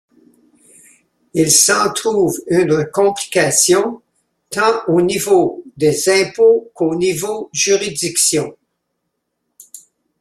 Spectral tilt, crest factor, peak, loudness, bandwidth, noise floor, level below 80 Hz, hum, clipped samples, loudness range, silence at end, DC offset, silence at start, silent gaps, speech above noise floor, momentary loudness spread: -3 dB/octave; 16 dB; 0 dBFS; -14 LUFS; 15.5 kHz; -73 dBFS; -56 dBFS; none; under 0.1%; 4 LU; 0.4 s; under 0.1%; 1.35 s; none; 58 dB; 9 LU